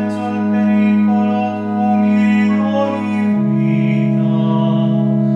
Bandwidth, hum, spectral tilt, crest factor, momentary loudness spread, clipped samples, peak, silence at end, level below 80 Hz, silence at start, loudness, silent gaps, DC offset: 5.8 kHz; none; -9 dB/octave; 10 dB; 5 LU; under 0.1%; -4 dBFS; 0 s; -68 dBFS; 0 s; -15 LUFS; none; under 0.1%